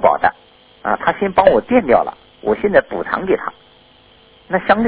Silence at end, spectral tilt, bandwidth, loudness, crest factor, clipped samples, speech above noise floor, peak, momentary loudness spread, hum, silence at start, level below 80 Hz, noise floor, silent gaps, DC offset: 0 s; -9.5 dB/octave; 4 kHz; -16 LUFS; 16 dB; under 0.1%; 33 dB; 0 dBFS; 11 LU; none; 0 s; -46 dBFS; -48 dBFS; none; under 0.1%